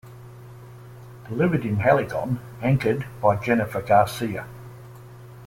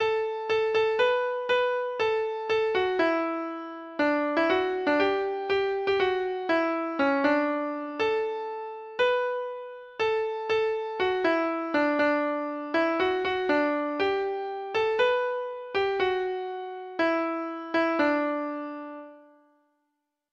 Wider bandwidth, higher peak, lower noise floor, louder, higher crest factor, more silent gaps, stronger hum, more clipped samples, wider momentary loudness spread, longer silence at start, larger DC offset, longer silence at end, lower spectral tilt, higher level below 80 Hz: first, 16.5 kHz vs 7.4 kHz; first, -6 dBFS vs -12 dBFS; second, -43 dBFS vs -80 dBFS; first, -23 LUFS vs -27 LUFS; about the same, 18 dB vs 16 dB; neither; neither; neither; first, 24 LU vs 9 LU; about the same, 0.05 s vs 0 s; neither; second, 0 s vs 1.1 s; first, -7.5 dB/octave vs -5 dB/octave; first, -52 dBFS vs -64 dBFS